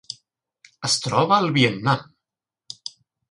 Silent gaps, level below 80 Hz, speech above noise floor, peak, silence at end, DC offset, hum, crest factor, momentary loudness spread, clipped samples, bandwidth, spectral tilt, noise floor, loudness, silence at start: none; -62 dBFS; 67 dB; -4 dBFS; 0.4 s; under 0.1%; none; 20 dB; 19 LU; under 0.1%; 11.5 kHz; -4 dB/octave; -87 dBFS; -20 LUFS; 0.1 s